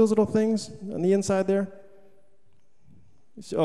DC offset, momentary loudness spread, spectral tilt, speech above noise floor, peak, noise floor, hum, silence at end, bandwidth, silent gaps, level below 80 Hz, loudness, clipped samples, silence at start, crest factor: 0.4%; 13 LU; -6.5 dB/octave; 44 dB; -10 dBFS; -68 dBFS; none; 0 s; 12 kHz; none; -62 dBFS; -25 LUFS; under 0.1%; 0 s; 16 dB